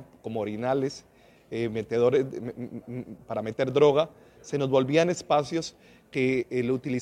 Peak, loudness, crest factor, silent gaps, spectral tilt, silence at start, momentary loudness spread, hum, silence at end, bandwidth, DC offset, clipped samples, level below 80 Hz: -6 dBFS; -27 LUFS; 20 dB; none; -6 dB/octave; 0 s; 15 LU; none; 0 s; 11 kHz; under 0.1%; under 0.1%; -64 dBFS